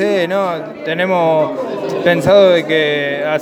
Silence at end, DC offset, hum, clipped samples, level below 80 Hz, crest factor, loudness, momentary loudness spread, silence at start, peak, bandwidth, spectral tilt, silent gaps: 0 s; under 0.1%; none; under 0.1%; -52 dBFS; 14 dB; -14 LUFS; 11 LU; 0 s; 0 dBFS; 13.5 kHz; -5.5 dB/octave; none